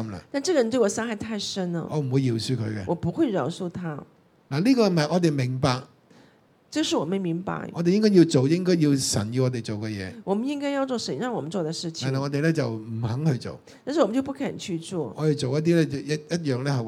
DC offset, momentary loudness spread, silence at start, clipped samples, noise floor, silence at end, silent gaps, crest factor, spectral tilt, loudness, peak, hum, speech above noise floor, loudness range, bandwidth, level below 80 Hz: under 0.1%; 10 LU; 0 s; under 0.1%; -58 dBFS; 0 s; none; 18 dB; -6 dB/octave; -25 LUFS; -6 dBFS; none; 34 dB; 5 LU; 15 kHz; -62 dBFS